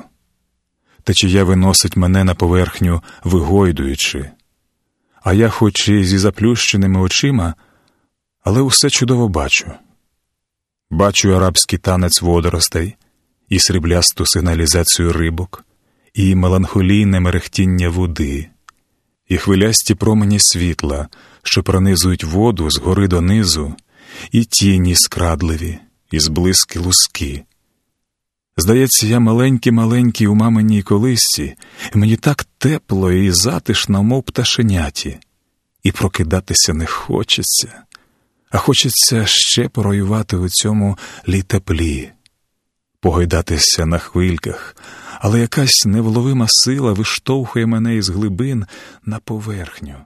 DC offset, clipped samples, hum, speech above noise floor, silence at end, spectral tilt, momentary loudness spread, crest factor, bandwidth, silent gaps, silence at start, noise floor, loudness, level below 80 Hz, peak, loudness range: under 0.1%; under 0.1%; none; 64 dB; 0.05 s; -4 dB/octave; 13 LU; 16 dB; 13.5 kHz; none; 1.05 s; -78 dBFS; -14 LUFS; -32 dBFS; 0 dBFS; 3 LU